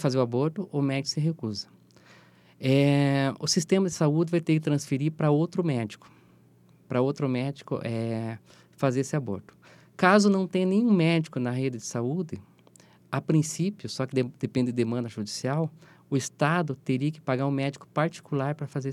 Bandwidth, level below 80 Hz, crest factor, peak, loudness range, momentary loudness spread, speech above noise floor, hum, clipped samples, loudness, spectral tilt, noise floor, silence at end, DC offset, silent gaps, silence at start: 14 kHz; -72 dBFS; 22 dB; -4 dBFS; 5 LU; 11 LU; 32 dB; none; under 0.1%; -27 LUFS; -6 dB/octave; -58 dBFS; 0 s; under 0.1%; none; 0 s